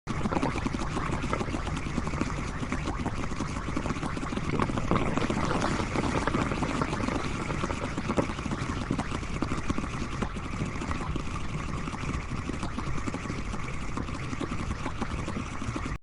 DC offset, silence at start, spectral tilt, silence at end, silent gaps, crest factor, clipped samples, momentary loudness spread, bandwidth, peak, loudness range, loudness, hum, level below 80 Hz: under 0.1%; 0.05 s; -5.5 dB/octave; 0 s; none; 22 dB; under 0.1%; 6 LU; 11.5 kHz; -8 dBFS; 5 LU; -32 LUFS; none; -38 dBFS